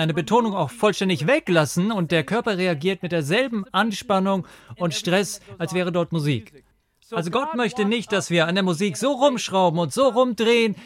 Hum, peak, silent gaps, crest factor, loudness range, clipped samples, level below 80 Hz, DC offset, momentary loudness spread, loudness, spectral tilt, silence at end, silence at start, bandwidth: none; -6 dBFS; none; 16 dB; 4 LU; under 0.1%; -62 dBFS; under 0.1%; 7 LU; -22 LUFS; -5 dB/octave; 0 s; 0 s; 16 kHz